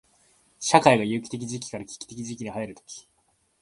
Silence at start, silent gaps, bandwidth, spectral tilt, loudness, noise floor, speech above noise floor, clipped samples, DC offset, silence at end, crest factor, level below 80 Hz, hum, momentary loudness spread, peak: 0.6 s; none; 11.5 kHz; -4 dB/octave; -25 LUFS; -69 dBFS; 43 dB; under 0.1%; under 0.1%; 0.6 s; 26 dB; -64 dBFS; none; 22 LU; 0 dBFS